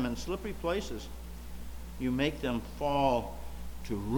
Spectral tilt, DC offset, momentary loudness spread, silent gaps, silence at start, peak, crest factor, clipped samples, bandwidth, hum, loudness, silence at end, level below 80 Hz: -6 dB/octave; under 0.1%; 17 LU; none; 0 s; -14 dBFS; 20 dB; under 0.1%; 19 kHz; none; -33 LUFS; 0 s; -44 dBFS